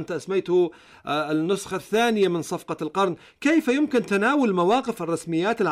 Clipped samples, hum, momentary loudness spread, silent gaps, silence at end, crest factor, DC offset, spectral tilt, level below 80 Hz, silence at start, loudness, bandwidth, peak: under 0.1%; none; 8 LU; none; 0 s; 12 dB; under 0.1%; -5.5 dB/octave; -64 dBFS; 0 s; -23 LUFS; 15 kHz; -12 dBFS